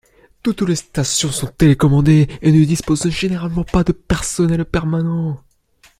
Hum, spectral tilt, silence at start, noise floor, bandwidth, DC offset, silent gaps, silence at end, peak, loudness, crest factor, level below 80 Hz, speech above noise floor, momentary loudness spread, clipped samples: none; -5.5 dB/octave; 0.45 s; -53 dBFS; 15 kHz; under 0.1%; none; 0.6 s; -2 dBFS; -16 LUFS; 14 dB; -34 dBFS; 38 dB; 8 LU; under 0.1%